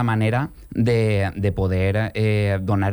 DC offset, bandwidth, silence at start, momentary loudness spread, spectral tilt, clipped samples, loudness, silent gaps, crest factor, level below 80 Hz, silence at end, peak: under 0.1%; over 20 kHz; 0 s; 4 LU; -8 dB/octave; under 0.1%; -21 LUFS; none; 12 dB; -40 dBFS; 0 s; -8 dBFS